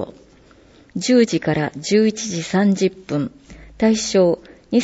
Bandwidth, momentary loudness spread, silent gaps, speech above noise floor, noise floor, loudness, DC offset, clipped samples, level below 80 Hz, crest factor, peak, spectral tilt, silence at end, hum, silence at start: 8 kHz; 10 LU; none; 31 dB; -49 dBFS; -19 LUFS; under 0.1%; under 0.1%; -50 dBFS; 16 dB; -4 dBFS; -5 dB/octave; 0 s; none; 0 s